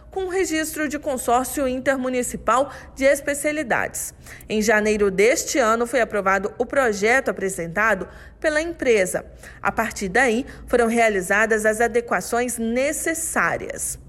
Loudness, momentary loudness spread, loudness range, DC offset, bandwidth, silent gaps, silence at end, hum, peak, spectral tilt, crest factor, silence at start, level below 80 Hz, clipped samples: -21 LUFS; 8 LU; 2 LU; under 0.1%; 16 kHz; none; 0 s; none; -8 dBFS; -3.5 dB/octave; 14 dB; 0.05 s; -46 dBFS; under 0.1%